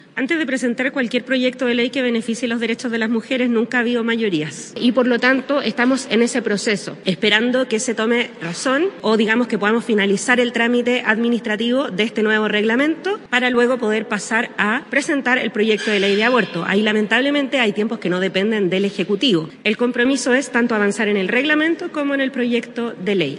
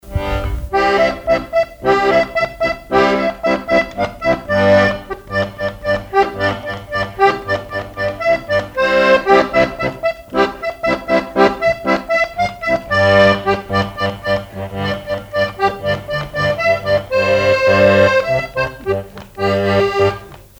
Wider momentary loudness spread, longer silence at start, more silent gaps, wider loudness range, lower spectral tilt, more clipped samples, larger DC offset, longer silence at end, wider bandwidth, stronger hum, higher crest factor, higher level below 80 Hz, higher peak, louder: second, 5 LU vs 10 LU; about the same, 0.15 s vs 0.05 s; neither; about the same, 2 LU vs 3 LU; second, -4 dB/octave vs -6 dB/octave; neither; neither; second, 0 s vs 0.15 s; second, 11 kHz vs over 20 kHz; neither; about the same, 18 dB vs 16 dB; second, -68 dBFS vs -36 dBFS; about the same, 0 dBFS vs 0 dBFS; about the same, -18 LUFS vs -16 LUFS